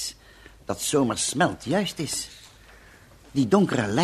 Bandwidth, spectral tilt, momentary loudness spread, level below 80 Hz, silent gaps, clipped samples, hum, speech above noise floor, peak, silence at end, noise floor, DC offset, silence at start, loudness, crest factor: 15 kHz; -4.5 dB/octave; 13 LU; -54 dBFS; none; under 0.1%; none; 27 dB; -6 dBFS; 0 s; -51 dBFS; under 0.1%; 0 s; -25 LUFS; 20 dB